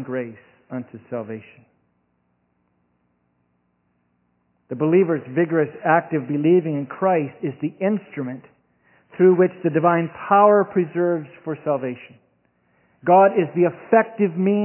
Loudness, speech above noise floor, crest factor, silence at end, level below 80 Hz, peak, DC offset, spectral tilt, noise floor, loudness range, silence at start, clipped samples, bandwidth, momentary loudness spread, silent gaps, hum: -20 LUFS; 49 dB; 20 dB; 0 s; -72 dBFS; -2 dBFS; under 0.1%; -12 dB/octave; -68 dBFS; 15 LU; 0 s; under 0.1%; 3.2 kHz; 18 LU; none; 60 Hz at -55 dBFS